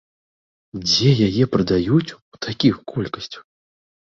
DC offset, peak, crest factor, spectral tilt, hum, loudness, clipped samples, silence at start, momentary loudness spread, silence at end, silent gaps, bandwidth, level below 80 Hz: under 0.1%; -2 dBFS; 18 dB; -6 dB/octave; none; -19 LUFS; under 0.1%; 0.75 s; 18 LU; 0.65 s; 2.22-2.32 s; 7.6 kHz; -48 dBFS